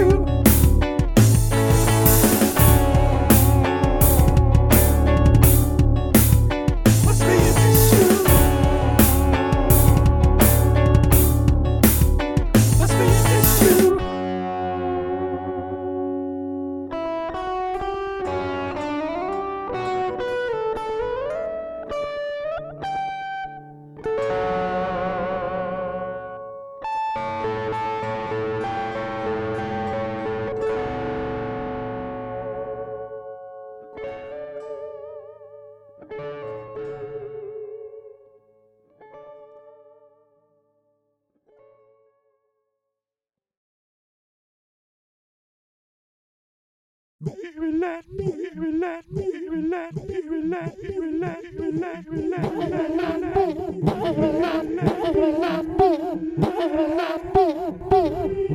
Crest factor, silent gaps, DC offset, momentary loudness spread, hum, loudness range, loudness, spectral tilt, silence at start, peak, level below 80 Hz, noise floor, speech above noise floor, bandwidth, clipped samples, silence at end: 20 dB; 43.57-47.19 s; under 0.1%; 18 LU; none; 19 LU; -20 LUFS; -6 dB/octave; 0 s; 0 dBFS; -28 dBFS; under -90 dBFS; over 67 dB; 19 kHz; under 0.1%; 0 s